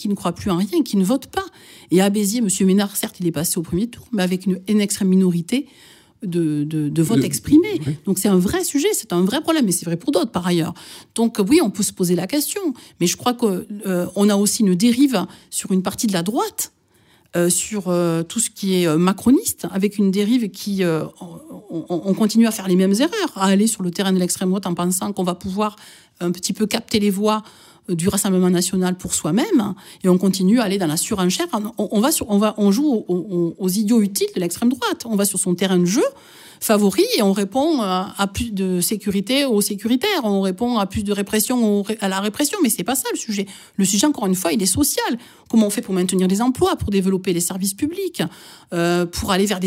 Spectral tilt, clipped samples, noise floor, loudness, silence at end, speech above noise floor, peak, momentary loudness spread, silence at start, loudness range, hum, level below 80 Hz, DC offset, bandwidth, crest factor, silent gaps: -4.5 dB/octave; under 0.1%; -56 dBFS; -19 LUFS; 0 s; 37 dB; -2 dBFS; 8 LU; 0 s; 2 LU; none; -50 dBFS; under 0.1%; 16 kHz; 16 dB; none